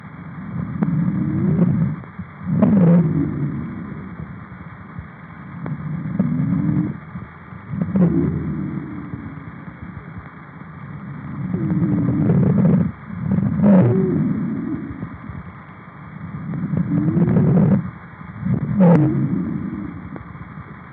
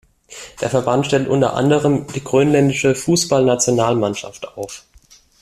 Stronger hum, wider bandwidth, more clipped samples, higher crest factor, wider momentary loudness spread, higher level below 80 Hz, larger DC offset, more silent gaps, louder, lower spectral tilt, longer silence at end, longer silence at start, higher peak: neither; second, 3.6 kHz vs 14.5 kHz; neither; about the same, 20 dB vs 16 dB; first, 21 LU vs 16 LU; about the same, -48 dBFS vs -50 dBFS; neither; neither; second, -19 LUFS vs -16 LUFS; first, -11 dB/octave vs -5 dB/octave; second, 0 s vs 0.6 s; second, 0 s vs 0.3 s; about the same, 0 dBFS vs -2 dBFS